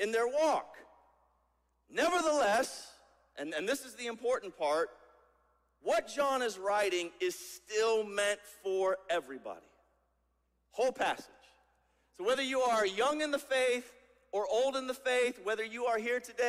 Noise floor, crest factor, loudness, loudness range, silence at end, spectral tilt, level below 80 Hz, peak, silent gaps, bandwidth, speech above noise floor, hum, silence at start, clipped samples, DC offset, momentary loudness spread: -77 dBFS; 18 dB; -33 LUFS; 5 LU; 0 s; -2 dB/octave; -74 dBFS; -18 dBFS; none; 15.5 kHz; 44 dB; none; 0 s; under 0.1%; under 0.1%; 12 LU